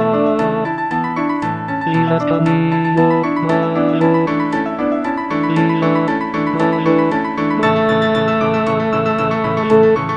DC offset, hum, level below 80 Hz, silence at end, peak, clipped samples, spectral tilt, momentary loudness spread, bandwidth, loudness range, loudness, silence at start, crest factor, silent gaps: under 0.1%; none; -50 dBFS; 0 s; -2 dBFS; under 0.1%; -8 dB/octave; 5 LU; 9.2 kHz; 1 LU; -16 LUFS; 0 s; 14 dB; none